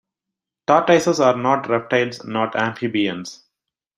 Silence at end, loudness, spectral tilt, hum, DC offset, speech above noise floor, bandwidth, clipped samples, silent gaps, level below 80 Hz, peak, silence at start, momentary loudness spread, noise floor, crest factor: 0.6 s; -19 LUFS; -5 dB/octave; none; under 0.1%; 66 dB; 14 kHz; under 0.1%; none; -64 dBFS; -2 dBFS; 0.7 s; 10 LU; -85 dBFS; 18 dB